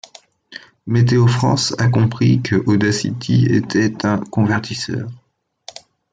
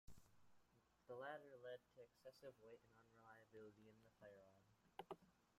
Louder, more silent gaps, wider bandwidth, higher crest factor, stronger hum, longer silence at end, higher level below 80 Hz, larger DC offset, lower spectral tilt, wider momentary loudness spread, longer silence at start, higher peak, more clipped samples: first, -17 LUFS vs -62 LUFS; neither; second, 9.2 kHz vs 15 kHz; second, 14 dB vs 22 dB; neither; first, 0.95 s vs 0 s; first, -52 dBFS vs -82 dBFS; neither; about the same, -6 dB/octave vs -5 dB/octave; first, 22 LU vs 12 LU; first, 0.5 s vs 0.05 s; first, -4 dBFS vs -40 dBFS; neither